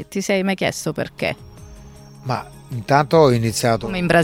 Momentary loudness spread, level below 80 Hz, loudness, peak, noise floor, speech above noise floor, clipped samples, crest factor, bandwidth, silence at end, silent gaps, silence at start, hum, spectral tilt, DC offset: 16 LU; -46 dBFS; -19 LUFS; -2 dBFS; -41 dBFS; 22 dB; under 0.1%; 18 dB; 17.5 kHz; 0 s; none; 0 s; none; -5.5 dB/octave; under 0.1%